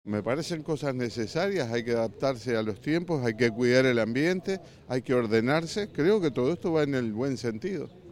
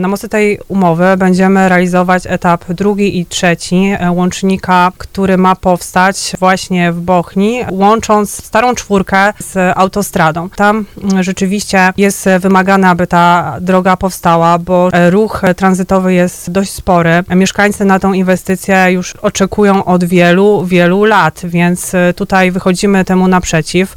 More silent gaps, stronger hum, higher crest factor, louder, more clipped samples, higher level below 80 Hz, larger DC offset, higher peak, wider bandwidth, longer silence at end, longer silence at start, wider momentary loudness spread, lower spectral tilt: neither; neither; first, 20 dB vs 10 dB; second, -28 LUFS vs -10 LUFS; second, under 0.1% vs 1%; second, -62 dBFS vs -36 dBFS; neither; second, -8 dBFS vs 0 dBFS; second, 14.5 kHz vs 16 kHz; about the same, 0 s vs 0 s; about the same, 0.05 s vs 0 s; first, 8 LU vs 5 LU; about the same, -6 dB/octave vs -5.5 dB/octave